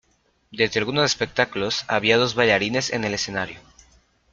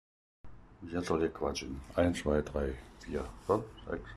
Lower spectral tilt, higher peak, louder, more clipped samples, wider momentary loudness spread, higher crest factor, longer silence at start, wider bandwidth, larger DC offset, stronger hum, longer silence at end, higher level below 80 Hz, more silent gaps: second, -3.5 dB/octave vs -6 dB/octave; first, -2 dBFS vs -14 dBFS; first, -21 LUFS vs -35 LUFS; neither; about the same, 8 LU vs 10 LU; about the same, 22 dB vs 20 dB; about the same, 0.5 s vs 0.45 s; second, 9 kHz vs 13 kHz; neither; neither; first, 0.75 s vs 0 s; second, -56 dBFS vs -48 dBFS; neither